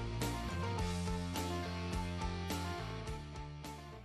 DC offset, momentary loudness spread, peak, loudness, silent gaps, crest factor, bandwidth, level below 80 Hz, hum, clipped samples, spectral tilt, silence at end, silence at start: under 0.1%; 9 LU; -24 dBFS; -41 LUFS; none; 16 dB; 13.5 kHz; -48 dBFS; none; under 0.1%; -5 dB/octave; 0 s; 0 s